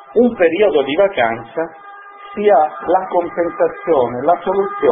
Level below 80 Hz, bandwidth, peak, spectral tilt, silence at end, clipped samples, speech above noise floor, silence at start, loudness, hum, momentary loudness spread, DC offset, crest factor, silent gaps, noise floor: -52 dBFS; 3.8 kHz; 0 dBFS; -10.5 dB/octave; 0 s; under 0.1%; 21 dB; 0 s; -16 LUFS; none; 13 LU; under 0.1%; 14 dB; none; -36 dBFS